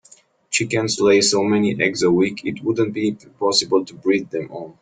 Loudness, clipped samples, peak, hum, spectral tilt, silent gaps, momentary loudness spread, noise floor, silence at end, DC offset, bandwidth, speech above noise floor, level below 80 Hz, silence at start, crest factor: -19 LUFS; under 0.1%; -4 dBFS; none; -4 dB/octave; none; 9 LU; -52 dBFS; 0.1 s; under 0.1%; 9.4 kHz; 33 dB; -58 dBFS; 0.5 s; 16 dB